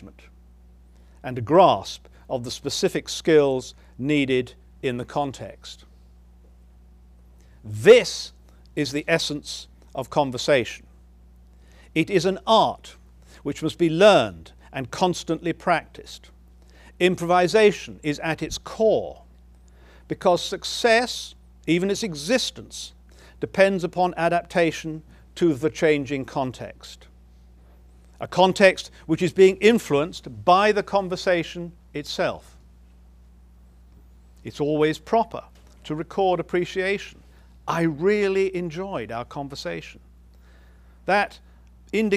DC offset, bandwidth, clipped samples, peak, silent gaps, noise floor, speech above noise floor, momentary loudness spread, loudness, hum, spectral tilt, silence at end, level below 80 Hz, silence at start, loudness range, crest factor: under 0.1%; 15.5 kHz; under 0.1%; -2 dBFS; none; -50 dBFS; 28 dB; 20 LU; -22 LUFS; none; -5 dB/octave; 0 s; -50 dBFS; 0 s; 7 LU; 20 dB